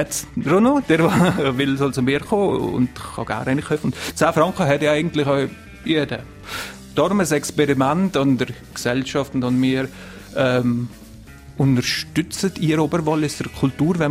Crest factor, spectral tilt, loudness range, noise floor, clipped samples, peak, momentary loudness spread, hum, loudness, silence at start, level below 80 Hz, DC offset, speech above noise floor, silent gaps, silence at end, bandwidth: 18 dB; -5.5 dB/octave; 3 LU; -40 dBFS; under 0.1%; -2 dBFS; 10 LU; none; -20 LUFS; 0 s; -46 dBFS; under 0.1%; 21 dB; none; 0 s; 16 kHz